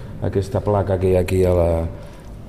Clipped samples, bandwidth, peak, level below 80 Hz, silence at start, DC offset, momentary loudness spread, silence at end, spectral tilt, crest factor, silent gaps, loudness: under 0.1%; 13.5 kHz; -6 dBFS; -34 dBFS; 0 s; 0.4%; 13 LU; 0 s; -8 dB/octave; 14 dB; none; -19 LUFS